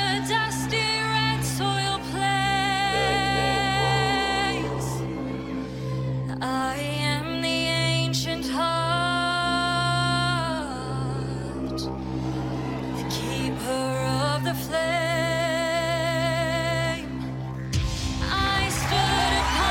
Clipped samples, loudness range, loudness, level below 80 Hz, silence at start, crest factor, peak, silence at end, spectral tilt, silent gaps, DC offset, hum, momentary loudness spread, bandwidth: under 0.1%; 5 LU; -25 LUFS; -40 dBFS; 0 s; 16 dB; -10 dBFS; 0 s; -4.5 dB/octave; none; under 0.1%; none; 8 LU; 17 kHz